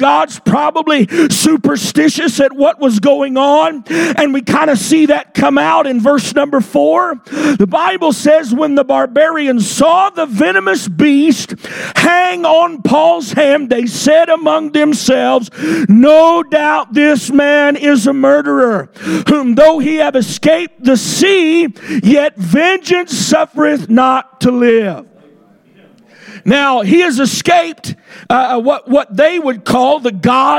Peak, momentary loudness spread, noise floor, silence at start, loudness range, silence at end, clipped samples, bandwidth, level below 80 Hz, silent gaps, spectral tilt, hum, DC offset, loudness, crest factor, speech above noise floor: 0 dBFS; 5 LU; -46 dBFS; 0 s; 3 LU; 0 s; under 0.1%; 17 kHz; -52 dBFS; none; -4.5 dB/octave; none; under 0.1%; -11 LUFS; 10 dB; 35 dB